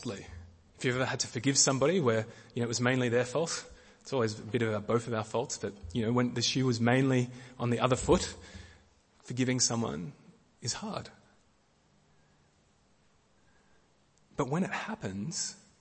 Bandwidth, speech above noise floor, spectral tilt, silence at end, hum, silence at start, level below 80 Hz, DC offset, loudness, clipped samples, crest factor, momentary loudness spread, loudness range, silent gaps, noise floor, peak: 8.8 kHz; 37 dB; -4 dB/octave; 0.25 s; none; 0 s; -56 dBFS; under 0.1%; -31 LUFS; under 0.1%; 22 dB; 15 LU; 13 LU; none; -68 dBFS; -12 dBFS